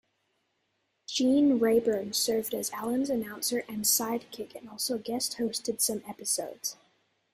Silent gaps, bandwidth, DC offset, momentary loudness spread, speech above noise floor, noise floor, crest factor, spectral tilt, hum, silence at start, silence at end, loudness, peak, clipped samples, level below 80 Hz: none; 16 kHz; under 0.1%; 12 LU; 48 dB; -77 dBFS; 16 dB; -2.5 dB/octave; none; 1.1 s; 0.6 s; -29 LUFS; -14 dBFS; under 0.1%; -70 dBFS